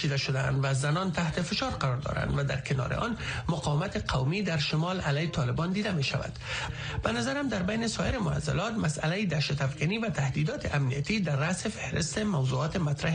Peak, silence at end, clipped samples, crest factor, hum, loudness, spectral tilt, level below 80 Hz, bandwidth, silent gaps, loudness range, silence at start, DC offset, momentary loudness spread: -12 dBFS; 0 s; under 0.1%; 18 dB; none; -30 LUFS; -5.5 dB/octave; -46 dBFS; 10 kHz; none; 1 LU; 0 s; under 0.1%; 3 LU